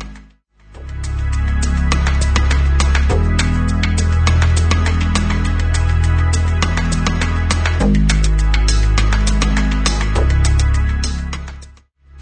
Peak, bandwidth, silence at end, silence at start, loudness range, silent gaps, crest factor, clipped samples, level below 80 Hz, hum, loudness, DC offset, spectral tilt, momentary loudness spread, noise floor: -2 dBFS; 9.4 kHz; 0 s; 0 s; 2 LU; none; 12 dB; under 0.1%; -16 dBFS; none; -16 LUFS; under 0.1%; -5 dB/octave; 6 LU; -46 dBFS